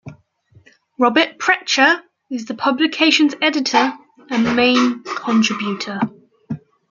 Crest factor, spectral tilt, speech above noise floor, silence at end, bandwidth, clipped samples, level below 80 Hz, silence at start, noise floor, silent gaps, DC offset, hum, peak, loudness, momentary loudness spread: 18 dB; -3.5 dB/octave; 36 dB; 0.3 s; 7.4 kHz; under 0.1%; -62 dBFS; 0.05 s; -53 dBFS; none; under 0.1%; none; -2 dBFS; -17 LUFS; 14 LU